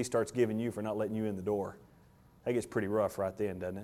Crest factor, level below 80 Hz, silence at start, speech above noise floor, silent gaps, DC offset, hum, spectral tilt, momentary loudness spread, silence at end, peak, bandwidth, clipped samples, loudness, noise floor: 18 dB; -66 dBFS; 0 s; 28 dB; none; under 0.1%; none; -6.5 dB/octave; 5 LU; 0 s; -16 dBFS; 16.5 kHz; under 0.1%; -34 LUFS; -61 dBFS